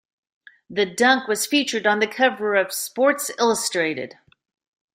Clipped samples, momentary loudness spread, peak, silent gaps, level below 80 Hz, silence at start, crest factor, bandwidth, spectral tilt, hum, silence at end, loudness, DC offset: under 0.1%; 7 LU; -4 dBFS; none; -70 dBFS; 0.7 s; 18 dB; 16 kHz; -2 dB/octave; none; 0.9 s; -20 LUFS; under 0.1%